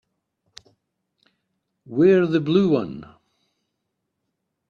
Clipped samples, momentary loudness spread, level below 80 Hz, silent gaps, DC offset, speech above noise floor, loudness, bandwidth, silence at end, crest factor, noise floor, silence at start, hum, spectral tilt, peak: under 0.1%; 16 LU; -64 dBFS; none; under 0.1%; 60 dB; -19 LUFS; 7 kHz; 1.65 s; 18 dB; -78 dBFS; 1.9 s; none; -8.5 dB/octave; -6 dBFS